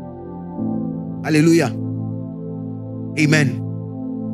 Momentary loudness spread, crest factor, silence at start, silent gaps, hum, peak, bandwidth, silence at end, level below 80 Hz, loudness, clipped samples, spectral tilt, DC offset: 14 LU; 18 dB; 0 s; none; none; -2 dBFS; 14 kHz; 0 s; -56 dBFS; -20 LUFS; under 0.1%; -6 dB/octave; under 0.1%